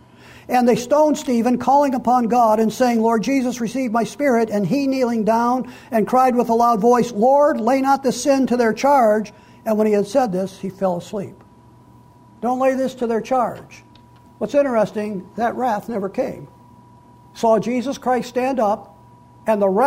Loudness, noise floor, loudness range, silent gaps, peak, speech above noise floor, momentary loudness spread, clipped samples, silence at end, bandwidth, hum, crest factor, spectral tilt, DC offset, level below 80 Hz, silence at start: -18 LUFS; -47 dBFS; 6 LU; none; -6 dBFS; 30 dB; 10 LU; under 0.1%; 0 s; 16 kHz; none; 12 dB; -6 dB/octave; under 0.1%; -56 dBFS; 0.5 s